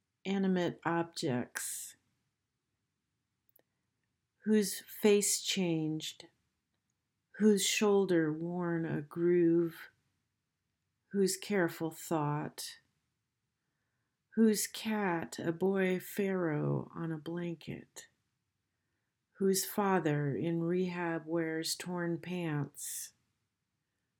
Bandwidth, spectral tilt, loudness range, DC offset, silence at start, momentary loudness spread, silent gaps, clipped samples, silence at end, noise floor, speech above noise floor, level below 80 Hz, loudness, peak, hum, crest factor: 18 kHz; -4.5 dB/octave; 7 LU; under 0.1%; 0.25 s; 12 LU; none; under 0.1%; 1.1 s; -86 dBFS; 53 dB; -78 dBFS; -33 LUFS; -16 dBFS; none; 18 dB